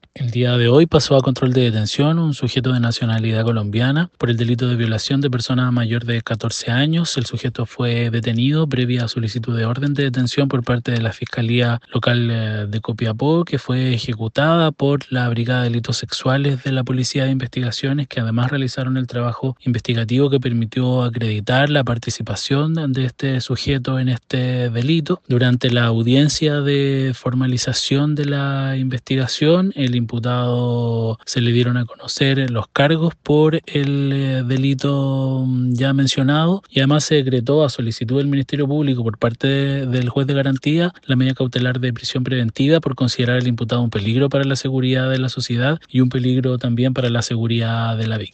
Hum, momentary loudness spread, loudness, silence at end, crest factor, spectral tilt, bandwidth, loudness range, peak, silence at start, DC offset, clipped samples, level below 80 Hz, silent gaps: none; 6 LU; -18 LUFS; 0.05 s; 18 dB; -6 dB/octave; 8.6 kHz; 2 LU; 0 dBFS; 0.15 s; under 0.1%; under 0.1%; -50 dBFS; none